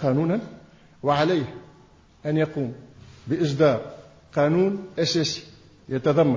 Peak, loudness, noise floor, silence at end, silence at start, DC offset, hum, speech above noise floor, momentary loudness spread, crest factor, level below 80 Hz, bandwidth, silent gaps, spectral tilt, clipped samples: -8 dBFS; -24 LUFS; -53 dBFS; 0 s; 0 s; under 0.1%; none; 31 dB; 15 LU; 16 dB; -58 dBFS; 7.6 kHz; none; -6 dB/octave; under 0.1%